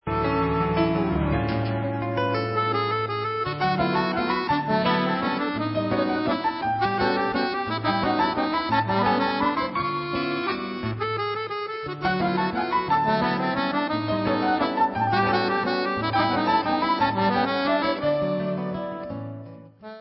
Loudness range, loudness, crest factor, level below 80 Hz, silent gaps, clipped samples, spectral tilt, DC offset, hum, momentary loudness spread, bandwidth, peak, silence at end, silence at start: 3 LU; -24 LUFS; 16 dB; -46 dBFS; none; under 0.1%; -10.5 dB/octave; under 0.1%; none; 6 LU; 5.8 kHz; -8 dBFS; 0 s; 0.05 s